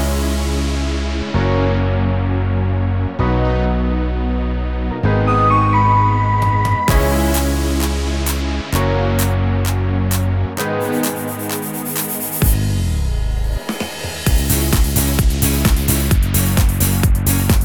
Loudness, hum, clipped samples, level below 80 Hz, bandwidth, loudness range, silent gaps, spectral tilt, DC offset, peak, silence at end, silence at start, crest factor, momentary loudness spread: -17 LUFS; none; under 0.1%; -20 dBFS; 19.5 kHz; 4 LU; none; -5.5 dB/octave; 0.7%; 0 dBFS; 0 s; 0 s; 16 dB; 7 LU